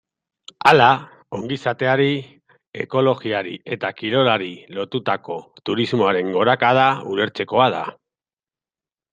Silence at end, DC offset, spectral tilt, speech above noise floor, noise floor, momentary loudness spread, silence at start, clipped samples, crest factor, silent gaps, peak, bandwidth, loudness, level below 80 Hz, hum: 1.2 s; under 0.1%; -6 dB/octave; over 71 dB; under -90 dBFS; 15 LU; 0.65 s; under 0.1%; 20 dB; 2.67-2.72 s; 0 dBFS; 13 kHz; -19 LUFS; -64 dBFS; none